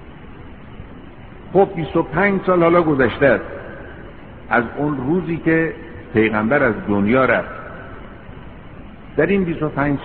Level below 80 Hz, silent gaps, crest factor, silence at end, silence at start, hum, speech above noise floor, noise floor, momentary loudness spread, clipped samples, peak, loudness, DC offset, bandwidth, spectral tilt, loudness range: -42 dBFS; none; 18 dB; 0 s; 0 s; none; 21 dB; -38 dBFS; 24 LU; under 0.1%; -2 dBFS; -18 LUFS; 0.6%; 4.5 kHz; -6 dB/octave; 3 LU